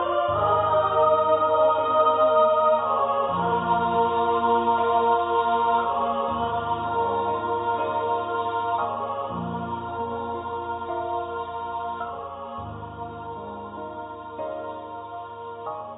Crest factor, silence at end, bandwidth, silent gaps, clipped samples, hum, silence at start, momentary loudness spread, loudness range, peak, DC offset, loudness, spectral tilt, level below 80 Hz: 16 dB; 0 s; 4 kHz; none; under 0.1%; none; 0 s; 16 LU; 13 LU; -8 dBFS; under 0.1%; -24 LUFS; -10 dB/octave; -52 dBFS